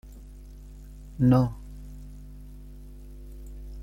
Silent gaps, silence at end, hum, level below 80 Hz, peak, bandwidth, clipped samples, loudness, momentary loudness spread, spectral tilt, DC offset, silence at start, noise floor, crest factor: none; 0 s; 50 Hz at -40 dBFS; -42 dBFS; -10 dBFS; 15 kHz; under 0.1%; -24 LUFS; 26 LU; -9.5 dB/octave; under 0.1%; 0.05 s; -44 dBFS; 20 dB